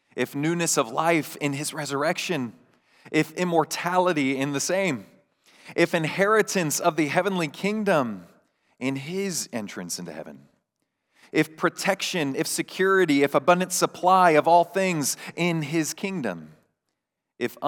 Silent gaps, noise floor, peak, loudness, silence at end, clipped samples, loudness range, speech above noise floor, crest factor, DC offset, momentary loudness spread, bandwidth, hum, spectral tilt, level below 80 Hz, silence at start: none; -82 dBFS; -4 dBFS; -24 LUFS; 0 s; under 0.1%; 8 LU; 58 dB; 20 dB; under 0.1%; 12 LU; over 20 kHz; none; -4 dB/octave; -84 dBFS; 0.15 s